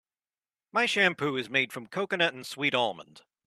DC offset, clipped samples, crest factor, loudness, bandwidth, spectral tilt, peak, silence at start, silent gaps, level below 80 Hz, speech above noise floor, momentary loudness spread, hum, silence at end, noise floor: under 0.1%; under 0.1%; 20 dB; -27 LUFS; 13.5 kHz; -3.5 dB/octave; -10 dBFS; 0.75 s; none; -76 dBFS; over 61 dB; 8 LU; none; 0.25 s; under -90 dBFS